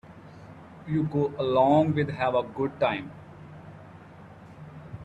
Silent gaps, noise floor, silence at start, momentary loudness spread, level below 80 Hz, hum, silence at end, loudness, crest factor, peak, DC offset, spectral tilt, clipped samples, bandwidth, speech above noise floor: none; -48 dBFS; 0.05 s; 26 LU; -60 dBFS; none; 0 s; -26 LUFS; 18 dB; -10 dBFS; under 0.1%; -8.5 dB/octave; under 0.1%; 8 kHz; 23 dB